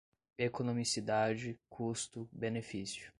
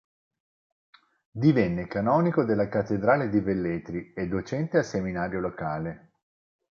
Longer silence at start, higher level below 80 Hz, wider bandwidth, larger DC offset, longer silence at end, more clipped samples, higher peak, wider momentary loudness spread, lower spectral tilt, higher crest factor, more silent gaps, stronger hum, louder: second, 0.4 s vs 1.35 s; second, -70 dBFS vs -54 dBFS; first, 11.5 kHz vs 7.2 kHz; neither; second, 0.1 s vs 0.75 s; neither; second, -20 dBFS vs -6 dBFS; about the same, 9 LU vs 10 LU; second, -4.5 dB/octave vs -8 dB/octave; about the same, 18 dB vs 20 dB; neither; neither; second, -38 LUFS vs -26 LUFS